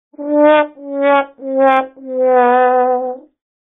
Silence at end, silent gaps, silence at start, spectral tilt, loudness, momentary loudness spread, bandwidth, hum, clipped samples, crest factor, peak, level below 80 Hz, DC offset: 0.45 s; none; 0.2 s; -1 dB/octave; -14 LUFS; 10 LU; 4 kHz; none; under 0.1%; 14 dB; 0 dBFS; -70 dBFS; under 0.1%